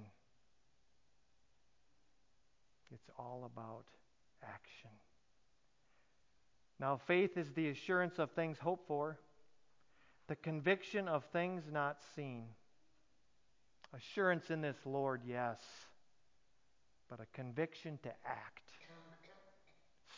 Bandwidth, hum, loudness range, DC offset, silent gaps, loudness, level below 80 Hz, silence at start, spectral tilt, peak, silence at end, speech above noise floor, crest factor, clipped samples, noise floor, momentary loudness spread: 7.6 kHz; none; 17 LU; under 0.1%; none; -41 LUFS; -84 dBFS; 0 s; -6.5 dB/octave; -22 dBFS; 0 s; 39 dB; 24 dB; under 0.1%; -80 dBFS; 22 LU